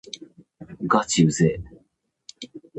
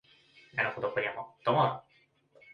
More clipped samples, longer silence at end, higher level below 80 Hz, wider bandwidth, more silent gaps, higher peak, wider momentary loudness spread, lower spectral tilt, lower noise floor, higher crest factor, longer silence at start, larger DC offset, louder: neither; second, 0 s vs 0.75 s; first, -52 dBFS vs -72 dBFS; first, 8.8 kHz vs 6.8 kHz; neither; first, -6 dBFS vs -14 dBFS; first, 24 LU vs 9 LU; second, -5 dB/octave vs -7.5 dB/octave; about the same, -67 dBFS vs -67 dBFS; about the same, 20 dB vs 20 dB; second, 0.15 s vs 0.55 s; neither; first, -21 LUFS vs -31 LUFS